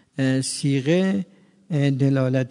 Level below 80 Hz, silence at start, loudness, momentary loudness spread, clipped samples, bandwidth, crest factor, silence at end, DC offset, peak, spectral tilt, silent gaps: -68 dBFS; 0.15 s; -22 LUFS; 8 LU; under 0.1%; 11 kHz; 14 dB; 0 s; under 0.1%; -8 dBFS; -6 dB/octave; none